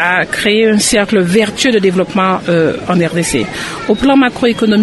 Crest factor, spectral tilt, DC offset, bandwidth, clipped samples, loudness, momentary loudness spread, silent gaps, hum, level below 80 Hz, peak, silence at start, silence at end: 12 dB; -4.5 dB/octave; under 0.1%; 12.5 kHz; under 0.1%; -12 LUFS; 5 LU; none; none; -40 dBFS; 0 dBFS; 0 s; 0 s